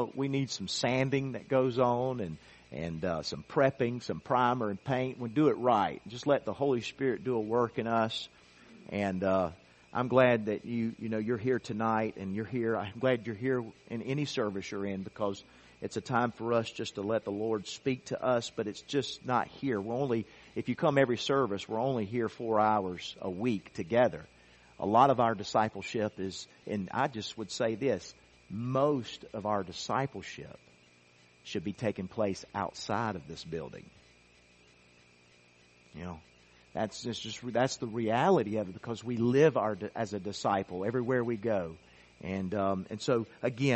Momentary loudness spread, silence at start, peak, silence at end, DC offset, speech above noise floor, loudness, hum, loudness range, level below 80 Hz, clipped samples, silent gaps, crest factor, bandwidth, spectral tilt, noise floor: 12 LU; 0 s; -10 dBFS; 0 s; under 0.1%; 31 dB; -32 LUFS; none; 7 LU; -66 dBFS; under 0.1%; none; 22 dB; 8.4 kHz; -6 dB/octave; -62 dBFS